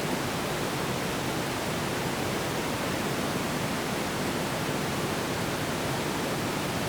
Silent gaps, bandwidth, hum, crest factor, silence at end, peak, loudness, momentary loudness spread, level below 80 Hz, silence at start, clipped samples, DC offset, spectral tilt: none; over 20 kHz; none; 14 dB; 0 s; -16 dBFS; -29 LUFS; 1 LU; -52 dBFS; 0 s; under 0.1%; under 0.1%; -4 dB/octave